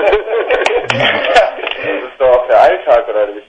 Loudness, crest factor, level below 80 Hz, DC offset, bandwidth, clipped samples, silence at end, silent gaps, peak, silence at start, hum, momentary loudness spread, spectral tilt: -12 LUFS; 12 dB; -40 dBFS; under 0.1%; 9.6 kHz; 0.1%; 0.1 s; none; 0 dBFS; 0 s; none; 8 LU; -4 dB/octave